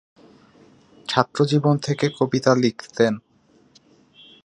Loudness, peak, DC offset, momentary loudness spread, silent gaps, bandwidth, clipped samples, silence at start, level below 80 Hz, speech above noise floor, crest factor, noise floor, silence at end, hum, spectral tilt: -21 LUFS; 0 dBFS; under 0.1%; 5 LU; none; 11 kHz; under 0.1%; 1.1 s; -64 dBFS; 36 dB; 22 dB; -56 dBFS; 1.25 s; none; -6 dB/octave